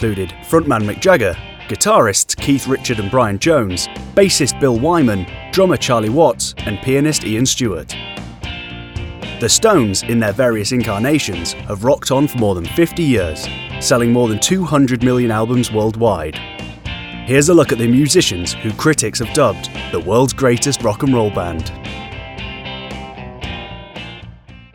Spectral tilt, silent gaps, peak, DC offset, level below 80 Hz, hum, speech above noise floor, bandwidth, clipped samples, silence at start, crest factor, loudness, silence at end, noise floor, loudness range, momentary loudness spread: -4.5 dB/octave; none; 0 dBFS; under 0.1%; -38 dBFS; none; 23 dB; over 20 kHz; under 0.1%; 0 s; 16 dB; -15 LUFS; 0.1 s; -38 dBFS; 3 LU; 16 LU